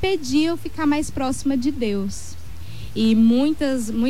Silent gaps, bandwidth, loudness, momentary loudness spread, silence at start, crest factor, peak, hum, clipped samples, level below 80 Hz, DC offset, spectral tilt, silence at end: none; 15 kHz; -21 LUFS; 19 LU; 0 s; 12 dB; -8 dBFS; none; under 0.1%; -42 dBFS; 3%; -5.5 dB/octave; 0 s